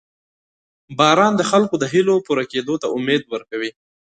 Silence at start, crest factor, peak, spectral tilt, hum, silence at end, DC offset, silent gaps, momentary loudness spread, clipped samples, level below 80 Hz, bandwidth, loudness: 0.9 s; 20 dB; 0 dBFS; -4.5 dB/octave; none; 0.45 s; under 0.1%; none; 12 LU; under 0.1%; -62 dBFS; 9.4 kHz; -18 LUFS